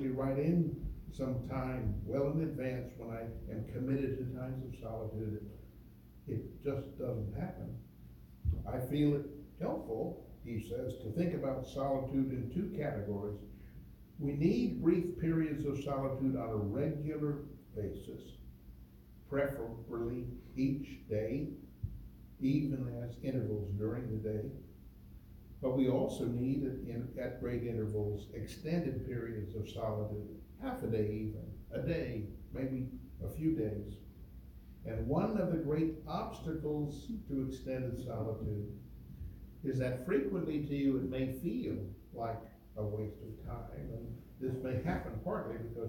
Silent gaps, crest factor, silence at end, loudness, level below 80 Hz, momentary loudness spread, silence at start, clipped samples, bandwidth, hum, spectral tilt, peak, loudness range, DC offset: none; 20 dB; 0 s; -38 LUFS; -52 dBFS; 16 LU; 0 s; under 0.1%; 17 kHz; none; -8.5 dB/octave; -18 dBFS; 5 LU; under 0.1%